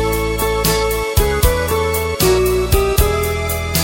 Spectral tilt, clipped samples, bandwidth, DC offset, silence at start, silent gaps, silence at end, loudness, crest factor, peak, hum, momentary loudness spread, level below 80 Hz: -4.5 dB/octave; under 0.1%; 17 kHz; under 0.1%; 0 s; none; 0 s; -16 LUFS; 16 dB; 0 dBFS; none; 4 LU; -22 dBFS